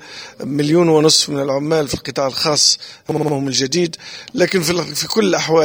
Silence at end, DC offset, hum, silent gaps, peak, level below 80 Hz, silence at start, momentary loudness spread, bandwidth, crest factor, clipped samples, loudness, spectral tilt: 0 s; under 0.1%; none; none; 0 dBFS; -50 dBFS; 0 s; 11 LU; over 20 kHz; 16 dB; under 0.1%; -16 LUFS; -3.5 dB/octave